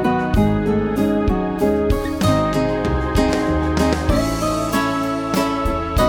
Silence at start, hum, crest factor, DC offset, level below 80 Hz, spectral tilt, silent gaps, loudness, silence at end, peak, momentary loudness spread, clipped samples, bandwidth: 0 s; none; 16 dB; under 0.1%; -28 dBFS; -6 dB/octave; none; -19 LUFS; 0 s; -2 dBFS; 3 LU; under 0.1%; 18 kHz